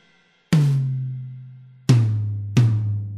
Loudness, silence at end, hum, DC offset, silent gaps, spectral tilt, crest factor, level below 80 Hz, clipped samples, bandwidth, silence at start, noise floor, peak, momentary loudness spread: -21 LUFS; 0 s; none; under 0.1%; none; -7.5 dB/octave; 18 dB; -50 dBFS; under 0.1%; 11.5 kHz; 0.5 s; -59 dBFS; -2 dBFS; 14 LU